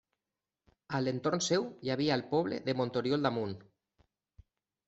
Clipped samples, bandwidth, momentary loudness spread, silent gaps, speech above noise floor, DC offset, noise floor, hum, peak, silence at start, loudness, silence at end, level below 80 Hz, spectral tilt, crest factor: under 0.1%; 8.2 kHz; 7 LU; none; over 58 dB; under 0.1%; under -90 dBFS; none; -14 dBFS; 0.9 s; -33 LUFS; 1.25 s; -70 dBFS; -5 dB/octave; 20 dB